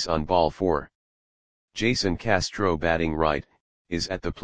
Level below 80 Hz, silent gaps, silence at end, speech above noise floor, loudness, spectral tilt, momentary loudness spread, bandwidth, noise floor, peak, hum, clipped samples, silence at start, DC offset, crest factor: -44 dBFS; 0.95-1.68 s, 3.60-3.85 s; 0 s; over 65 dB; -25 LUFS; -5 dB/octave; 7 LU; 10 kHz; under -90 dBFS; -4 dBFS; none; under 0.1%; 0 s; 0.9%; 22 dB